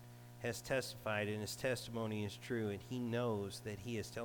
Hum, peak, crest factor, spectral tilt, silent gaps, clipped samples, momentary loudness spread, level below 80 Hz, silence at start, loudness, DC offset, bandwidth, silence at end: 60 Hz at -55 dBFS; -26 dBFS; 16 dB; -5 dB/octave; none; under 0.1%; 5 LU; -68 dBFS; 0 s; -41 LUFS; under 0.1%; 19 kHz; 0 s